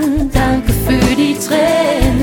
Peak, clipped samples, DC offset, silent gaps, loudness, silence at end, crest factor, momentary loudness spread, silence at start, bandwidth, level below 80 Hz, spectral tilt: 0 dBFS; under 0.1%; under 0.1%; none; -13 LUFS; 0 s; 12 dB; 2 LU; 0 s; 19 kHz; -22 dBFS; -5.5 dB/octave